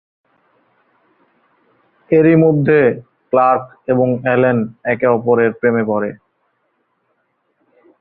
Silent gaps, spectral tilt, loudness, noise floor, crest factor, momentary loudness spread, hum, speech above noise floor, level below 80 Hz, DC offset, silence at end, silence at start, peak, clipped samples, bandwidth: none; -12.5 dB/octave; -14 LUFS; -66 dBFS; 16 dB; 8 LU; none; 52 dB; -58 dBFS; under 0.1%; 1.85 s; 2.1 s; -2 dBFS; under 0.1%; 4.2 kHz